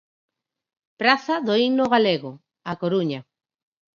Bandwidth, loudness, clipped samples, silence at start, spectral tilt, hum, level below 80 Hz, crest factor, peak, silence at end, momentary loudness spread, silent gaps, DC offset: 7.4 kHz; -21 LUFS; under 0.1%; 1 s; -6 dB/octave; none; -68 dBFS; 22 dB; -2 dBFS; 0.75 s; 15 LU; none; under 0.1%